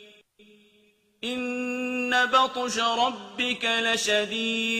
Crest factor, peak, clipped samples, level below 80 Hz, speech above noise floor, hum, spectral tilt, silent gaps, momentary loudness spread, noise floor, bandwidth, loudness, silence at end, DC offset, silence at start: 20 dB; -8 dBFS; under 0.1%; -70 dBFS; 38 dB; none; -1.5 dB/octave; none; 8 LU; -63 dBFS; 15.5 kHz; -25 LUFS; 0 s; under 0.1%; 0 s